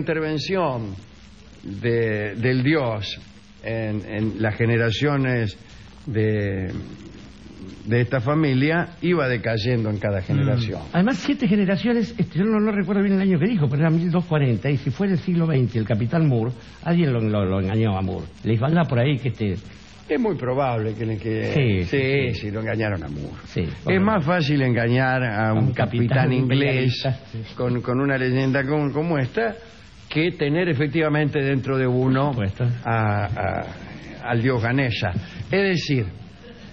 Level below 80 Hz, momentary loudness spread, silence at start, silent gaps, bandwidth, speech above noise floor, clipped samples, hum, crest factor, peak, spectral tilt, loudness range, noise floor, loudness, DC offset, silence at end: -48 dBFS; 10 LU; 0 s; none; 7.2 kHz; 24 dB; under 0.1%; none; 14 dB; -8 dBFS; -8 dB/octave; 3 LU; -45 dBFS; -22 LUFS; 0.2%; 0 s